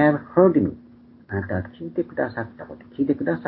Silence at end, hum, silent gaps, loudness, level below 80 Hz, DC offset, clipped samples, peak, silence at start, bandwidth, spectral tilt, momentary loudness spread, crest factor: 0 s; none; none; -23 LUFS; -48 dBFS; under 0.1%; under 0.1%; -2 dBFS; 0 s; 4.6 kHz; -12.5 dB/octave; 18 LU; 20 dB